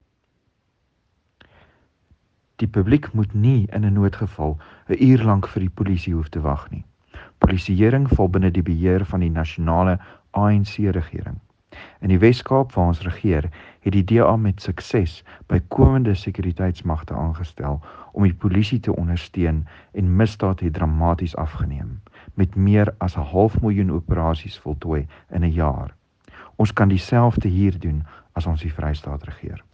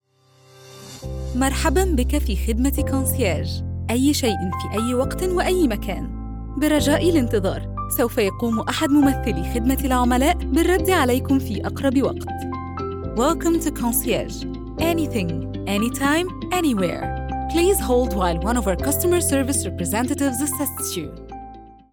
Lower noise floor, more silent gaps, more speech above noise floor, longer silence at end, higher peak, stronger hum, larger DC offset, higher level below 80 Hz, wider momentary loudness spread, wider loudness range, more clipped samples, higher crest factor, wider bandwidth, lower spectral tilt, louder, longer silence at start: first, -69 dBFS vs -55 dBFS; neither; first, 49 dB vs 35 dB; about the same, 0.15 s vs 0.2 s; first, 0 dBFS vs -6 dBFS; neither; neither; about the same, -34 dBFS vs -30 dBFS; about the same, 12 LU vs 11 LU; about the same, 3 LU vs 3 LU; neither; first, 20 dB vs 14 dB; second, 7.2 kHz vs 19.5 kHz; first, -9 dB/octave vs -5 dB/octave; about the same, -21 LUFS vs -21 LUFS; first, 2.6 s vs 0.6 s